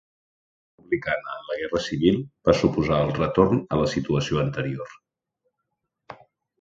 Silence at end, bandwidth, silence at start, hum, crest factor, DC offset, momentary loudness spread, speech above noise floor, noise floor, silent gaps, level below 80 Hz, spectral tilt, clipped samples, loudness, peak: 0.5 s; 7.8 kHz; 0.9 s; none; 22 dB; under 0.1%; 10 LU; 57 dB; -80 dBFS; none; -46 dBFS; -6.5 dB/octave; under 0.1%; -24 LUFS; -4 dBFS